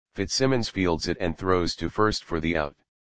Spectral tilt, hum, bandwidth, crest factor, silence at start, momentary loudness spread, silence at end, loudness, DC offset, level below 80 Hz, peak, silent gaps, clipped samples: -4.5 dB/octave; none; 10 kHz; 20 dB; 0.05 s; 5 LU; 0.25 s; -26 LUFS; 0.8%; -44 dBFS; -6 dBFS; none; under 0.1%